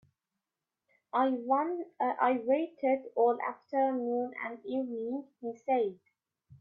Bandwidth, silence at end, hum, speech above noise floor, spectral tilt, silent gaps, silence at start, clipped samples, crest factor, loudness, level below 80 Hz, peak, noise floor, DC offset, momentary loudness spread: 6.6 kHz; 0.05 s; none; 58 dB; -7.5 dB/octave; none; 1.15 s; under 0.1%; 16 dB; -32 LUFS; -82 dBFS; -16 dBFS; -90 dBFS; under 0.1%; 9 LU